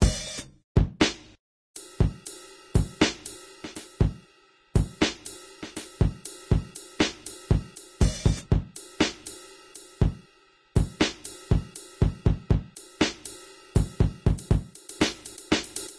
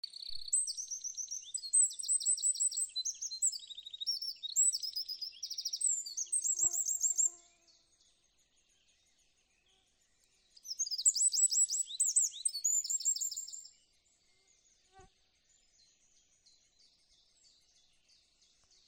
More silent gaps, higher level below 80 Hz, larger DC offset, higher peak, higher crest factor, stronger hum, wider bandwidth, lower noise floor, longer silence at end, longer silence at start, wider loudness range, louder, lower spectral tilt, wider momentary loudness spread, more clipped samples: first, 0.64-0.75 s, 1.39-1.74 s vs none; first, -34 dBFS vs -78 dBFS; neither; first, -8 dBFS vs -16 dBFS; about the same, 20 dB vs 20 dB; neither; second, 11 kHz vs 17 kHz; second, -59 dBFS vs -73 dBFS; second, 0 s vs 3.85 s; about the same, 0 s vs 0.05 s; second, 2 LU vs 8 LU; first, -27 LUFS vs -32 LUFS; first, -5 dB/octave vs 4 dB/octave; first, 17 LU vs 13 LU; neither